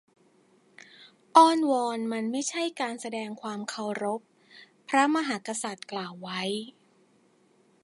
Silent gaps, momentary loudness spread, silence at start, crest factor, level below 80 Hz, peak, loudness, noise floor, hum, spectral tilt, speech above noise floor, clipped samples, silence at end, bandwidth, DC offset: none; 15 LU; 1 s; 24 dB; -84 dBFS; -4 dBFS; -27 LUFS; -64 dBFS; none; -3.5 dB/octave; 37 dB; under 0.1%; 1.15 s; 11.5 kHz; under 0.1%